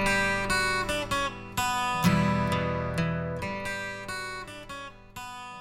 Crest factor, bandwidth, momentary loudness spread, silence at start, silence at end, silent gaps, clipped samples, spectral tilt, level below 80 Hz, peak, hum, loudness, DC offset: 20 dB; 16 kHz; 15 LU; 0 s; 0 s; none; under 0.1%; -4.5 dB/octave; -46 dBFS; -10 dBFS; none; -28 LUFS; under 0.1%